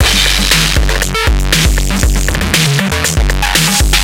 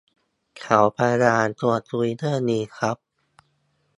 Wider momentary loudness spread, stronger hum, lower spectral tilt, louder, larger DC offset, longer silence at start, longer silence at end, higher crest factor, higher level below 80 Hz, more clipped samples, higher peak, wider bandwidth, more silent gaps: second, 4 LU vs 9 LU; neither; second, -3 dB/octave vs -6 dB/octave; first, -11 LUFS vs -22 LUFS; first, 0.7% vs under 0.1%; second, 0 s vs 0.55 s; second, 0 s vs 1.05 s; second, 10 dB vs 22 dB; first, -14 dBFS vs -62 dBFS; neither; about the same, 0 dBFS vs 0 dBFS; first, 17 kHz vs 11 kHz; neither